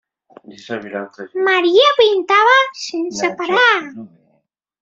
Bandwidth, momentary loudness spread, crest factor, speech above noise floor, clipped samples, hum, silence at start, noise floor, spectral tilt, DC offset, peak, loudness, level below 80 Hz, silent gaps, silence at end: 7.8 kHz; 17 LU; 16 dB; 50 dB; under 0.1%; none; 0.5 s; -65 dBFS; -2.5 dB/octave; under 0.1%; -2 dBFS; -14 LUFS; -66 dBFS; none; 0.75 s